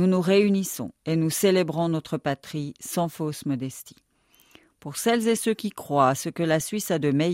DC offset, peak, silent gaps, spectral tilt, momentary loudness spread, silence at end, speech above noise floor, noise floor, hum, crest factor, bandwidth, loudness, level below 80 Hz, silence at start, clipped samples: under 0.1%; -6 dBFS; none; -5.5 dB/octave; 12 LU; 0 s; 37 dB; -61 dBFS; none; 18 dB; 16 kHz; -25 LUFS; -64 dBFS; 0 s; under 0.1%